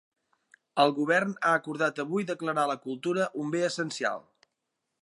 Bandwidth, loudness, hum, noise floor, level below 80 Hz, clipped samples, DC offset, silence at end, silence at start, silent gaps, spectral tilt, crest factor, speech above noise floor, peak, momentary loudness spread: 11.5 kHz; -28 LUFS; none; -83 dBFS; -82 dBFS; under 0.1%; under 0.1%; 0.8 s; 0.75 s; none; -4.5 dB/octave; 22 dB; 55 dB; -8 dBFS; 7 LU